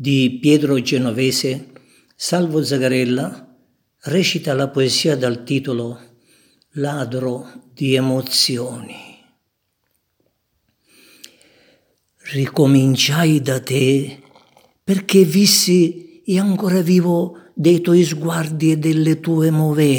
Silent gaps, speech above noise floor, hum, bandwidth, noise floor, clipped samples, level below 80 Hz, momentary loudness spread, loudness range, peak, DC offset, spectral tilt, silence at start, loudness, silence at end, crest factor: none; 54 dB; none; 19 kHz; -71 dBFS; under 0.1%; -66 dBFS; 13 LU; 7 LU; 0 dBFS; under 0.1%; -5 dB/octave; 0 s; -17 LUFS; 0 s; 18 dB